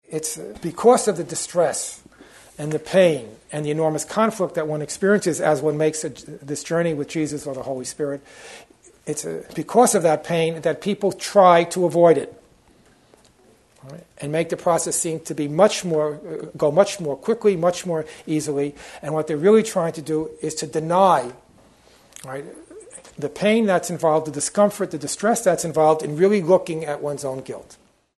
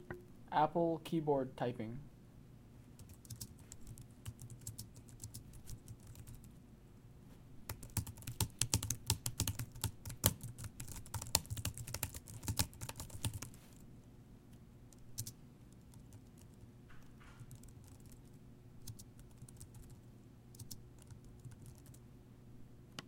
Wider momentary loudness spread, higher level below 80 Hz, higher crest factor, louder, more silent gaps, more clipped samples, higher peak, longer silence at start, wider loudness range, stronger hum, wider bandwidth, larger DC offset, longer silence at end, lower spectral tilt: second, 16 LU vs 23 LU; about the same, -60 dBFS vs -60 dBFS; second, 20 dB vs 38 dB; first, -21 LUFS vs -41 LUFS; neither; neither; first, -2 dBFS vs -8 dBFS; about the same, 0.1 s vs 0 s; second, 5 LU vs 17 LU; neither; second, 12.5 kHz vs 17 kHz; neither; first, 0.45 s vs 0 s; about the same, -4.5 dB/octave vs -4 dB/octave